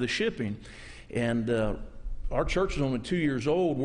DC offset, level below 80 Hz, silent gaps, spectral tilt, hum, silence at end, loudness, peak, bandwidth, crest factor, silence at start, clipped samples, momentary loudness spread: under 0.1%; -40 dBFS; none; -6 dB/octave; none; 0 s; -29 LUFS; -14 dBFS; 10.5 kHz; 14 dB; 0 s; under 0.1%; 15 LU